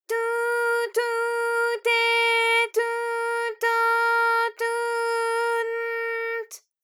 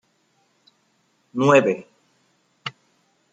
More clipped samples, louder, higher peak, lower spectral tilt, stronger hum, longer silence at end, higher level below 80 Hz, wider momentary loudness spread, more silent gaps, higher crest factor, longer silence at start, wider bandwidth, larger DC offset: neither; second, -23 LUFS vs -19 LUFS; second, -12 dBFS vs -2 dBFS; second, 3.5 dB/octave vs -6 dB/octave; neither; second, 0.25 s vs 0.65 s; second, under -90 dBFS vs -72 dBFS; second, 8 LU vs 19 LU; neither; second, 12 dB vs 22 dB; second, 0.1 s vs 1.35 s; first, 18 kHz vs 9 kHz; neither